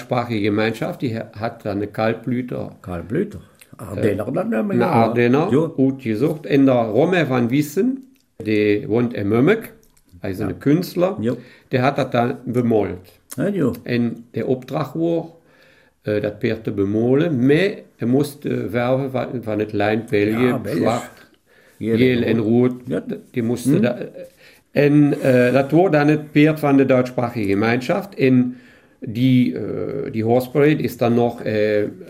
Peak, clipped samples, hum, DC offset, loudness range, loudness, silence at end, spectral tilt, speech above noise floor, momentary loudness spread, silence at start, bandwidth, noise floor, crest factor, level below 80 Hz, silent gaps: -2 dBFS; under 0.1%; none; under 0.1%; 7 LU; -19 LUFS; 0 s; -7.5 dB/octave; 35 dB; 11 LU; 0 s; 16 kHz; -53 dBFS; 18 dB; -56 dBFS; none